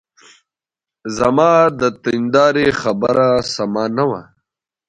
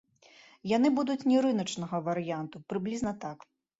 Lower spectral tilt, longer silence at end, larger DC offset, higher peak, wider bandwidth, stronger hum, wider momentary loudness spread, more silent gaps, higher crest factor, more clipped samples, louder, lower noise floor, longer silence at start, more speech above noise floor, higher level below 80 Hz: about the same, -5.5 dB/octave vs -6 dB/octave; first, 0.65 s vs 0.45 s; neither; first, 0 dBFS vs -14 dBFS; first, 10.5 kHz vs 8 kHz; neither; second, 8 LU vs 15 LU; neither; about the same, 16 dB vs 16 dB; neither; first, -15 LUFS vs -30 LUFS; first, -88 dBFS vs -58 dBFS; first, 1.05 s vs 0.65 s; first, 73 dB vs 29 dB; first, -50 dBFS vs -66 dBFS